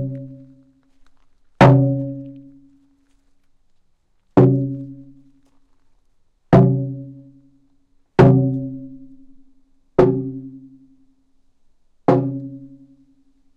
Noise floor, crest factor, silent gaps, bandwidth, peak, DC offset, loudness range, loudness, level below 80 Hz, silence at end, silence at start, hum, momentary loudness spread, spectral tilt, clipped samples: -60 dBFS; 18 dB; none; 6.4 kHz; -2 dBFS; under 0.1%; 6 LU; -17 LUFS; -46 dBFS; 0.9 s; 0 s; none; 24 LU; -9.5 dB/octave; under 0.1%